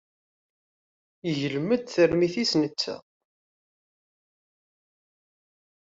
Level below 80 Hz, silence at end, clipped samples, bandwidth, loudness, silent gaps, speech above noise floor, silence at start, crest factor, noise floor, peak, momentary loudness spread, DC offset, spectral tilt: -64 dBFS; 2.9 s; under 0.1%; 7.8 kHz; -25 LUFS; none; over 65 dB; 1.25 s; 20 dB; under -90 dBFS; -10 dBFS; 10 LU; under 0.1%; -5 dB/octave